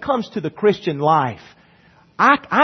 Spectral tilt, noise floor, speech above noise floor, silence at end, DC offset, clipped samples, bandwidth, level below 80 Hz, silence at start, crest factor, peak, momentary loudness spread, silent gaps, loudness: -6.5 dB/octave; -52 dBFS; 35 dB; 0 s; under 0.1%; under 0.1%; 6.4 kHz; -60 dBFS; 0 s; 18 dB; 0 dBFS; 11 LU; none; -18 LUFS